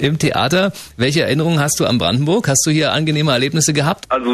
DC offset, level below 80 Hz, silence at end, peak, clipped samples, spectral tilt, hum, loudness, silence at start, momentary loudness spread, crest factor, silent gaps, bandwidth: under 0.1%; -46 dBFS; 0 s; -2 dBFS; under 0.1%; -4 dB/octave; none; -15 LUFS; 0 s; 4 LU; 14 dB; none; 13.5 kHz